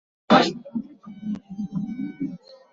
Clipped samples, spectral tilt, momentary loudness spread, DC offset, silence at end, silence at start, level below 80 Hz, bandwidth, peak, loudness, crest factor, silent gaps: under 0.1%; -5.5 dB/octave; 18 LU; under 0.1%; 0.2 s; 0.3 s; -62 dBFS; 7.8 kHz; -2 dBFS; -25 LUFS; 24 dB; none